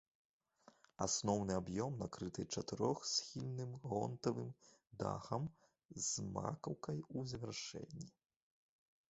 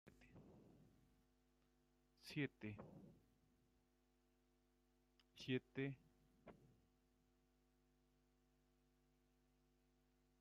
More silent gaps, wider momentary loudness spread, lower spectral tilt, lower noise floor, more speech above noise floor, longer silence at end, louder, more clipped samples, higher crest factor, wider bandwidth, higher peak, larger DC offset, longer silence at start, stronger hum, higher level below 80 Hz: first, 5.85-5.89 s vs none; second, 12 LU vs 21 LU; about the same, -5.5 dB/octave vs -5.5 dB/octave; second, -70 dBFS vs -82 dBFS; second, 27 dB vs 32 dB; second, 1 s vs 3.7 s; first, -43 LUFS vs -51 LUFS; neither; about the same, 22 dB vs 26 dB; first, 8 kHz vs 7.2 kHz; first, -22 dBFS vs -32 dBFS; neither; first, 0.65 s vs 0.05 s; neither; first, -68 dBFS vs -82 dBFS